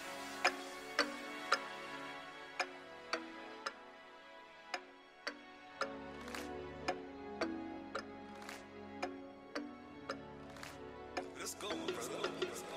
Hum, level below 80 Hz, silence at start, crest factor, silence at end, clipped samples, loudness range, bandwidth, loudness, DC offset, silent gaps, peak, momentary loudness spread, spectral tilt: none; -70 dBFS; 0 s; 28 dB; 0 s; under 0.1%; 6 LU; 16 kHz; -44 LUFS; under 0.1%; none; -18 dBFS; 14 LU; -2.5 dB/octave